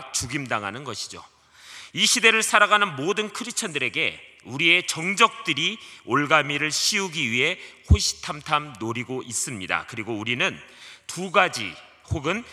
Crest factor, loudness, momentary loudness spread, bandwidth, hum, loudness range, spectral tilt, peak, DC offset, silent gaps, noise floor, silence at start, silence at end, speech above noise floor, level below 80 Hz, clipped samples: 24 dB; -22 LUFS; 16 LU; 14.5 kHz; none; 5 LU; -2.5 dB/octave; 0 dBFS; under 0.1%; none; -45 dBFS; 0 s; 0 s; 21 dB; -40 dBFS; under 0.1%